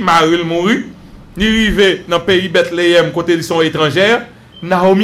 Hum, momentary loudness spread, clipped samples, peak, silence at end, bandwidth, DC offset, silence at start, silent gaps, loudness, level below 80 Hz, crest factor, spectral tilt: none; 6 LU; under 0.1%; 0 dBFS; 0 s; 15.5 kHz; under 0.1%; 0 s; none; -12 LUFS; -34 dBFS; 12 dB; -5 dB/octave